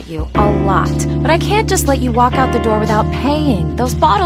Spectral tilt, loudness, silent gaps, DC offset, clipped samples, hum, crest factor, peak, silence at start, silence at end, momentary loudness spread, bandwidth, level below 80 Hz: -5.5 dB/octave; -14 LUFS; none; under 0.1%; under 0.1%; none; 12 dB; 0 dBFS; 0 s; 0 s; 3 LU; 16 kHz; -24 dBFS